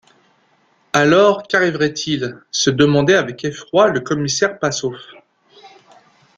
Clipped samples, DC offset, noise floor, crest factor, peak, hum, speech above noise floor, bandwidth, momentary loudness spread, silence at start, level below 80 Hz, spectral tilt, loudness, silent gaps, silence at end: under 0.1%; under 0.1%; -58 dBFS; 18 dB; 0 dBFS; none; 42 dB; 9.2 kHz; 11 LU; 0.95 s; -56 dBFS; -4.5 dB/octave; -16 LUFS; none; 0.7 s